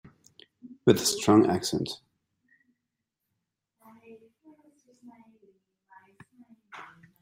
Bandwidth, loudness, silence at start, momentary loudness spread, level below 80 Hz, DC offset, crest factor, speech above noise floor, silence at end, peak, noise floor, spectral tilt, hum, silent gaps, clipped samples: 16 kHz; -24 LUFS; 0.65 s; 25 LU; -68 dBFS; under 0.1%; 26 dB; 61 dB; 0.35 s; -4 dBFS; -84 dBFS; -4.5 dB/octave; none; none; under 0.1%